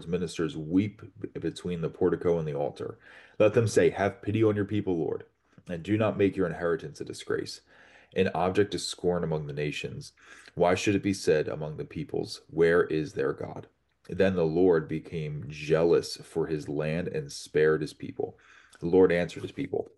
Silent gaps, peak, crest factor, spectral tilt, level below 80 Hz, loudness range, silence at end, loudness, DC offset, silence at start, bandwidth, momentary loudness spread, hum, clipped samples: none; -10 dBFS; 18 dB; -6 dB/octave; -58 dBFS; 3 LU; 0.1 s; -28 LUFS; under 0.1%; 0 s; 12 kHz; 14 LU; none; under 0.1%